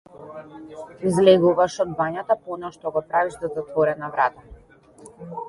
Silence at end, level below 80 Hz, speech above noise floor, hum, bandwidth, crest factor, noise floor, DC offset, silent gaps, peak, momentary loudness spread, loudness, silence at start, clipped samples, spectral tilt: 0 s; -56 dBFS; 29 dB; none; 11.5 kHz; 20 dB; -50 dBFS; under 0.1%; none; -2 dBFS; 23 LU; -22 LUFS; 0.15 s; under 0.1%; -6 dB/octave